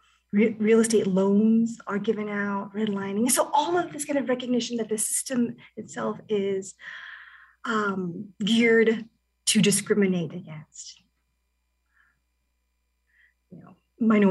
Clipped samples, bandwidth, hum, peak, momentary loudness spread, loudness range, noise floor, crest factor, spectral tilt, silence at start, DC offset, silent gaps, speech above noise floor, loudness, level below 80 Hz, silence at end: under 0.1%; 13 kHz; 60 Hz at -55 dBFS; -8 dBFS; 19 LU; 6 LU; -74 dBFS; 18 dB; -4.5 dB/octave; 0.35 s; under 0.1%; none; 50 dB; -24 LUFS; -72 dBFS; 0 s